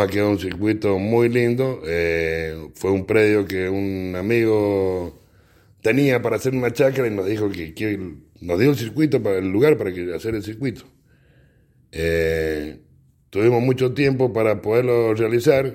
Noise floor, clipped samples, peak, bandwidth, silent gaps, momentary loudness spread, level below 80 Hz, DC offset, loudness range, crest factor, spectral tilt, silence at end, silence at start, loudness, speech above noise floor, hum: -56 dBFS; under 0.1%; -2 dBFS; 16.5 kHz; none; 10 LU; -50 dBFS; under 0.1%; 3 LU; 18 dB; -7 dB/octave; 0 s; 0 s; -20 LUFS; 36 dB; none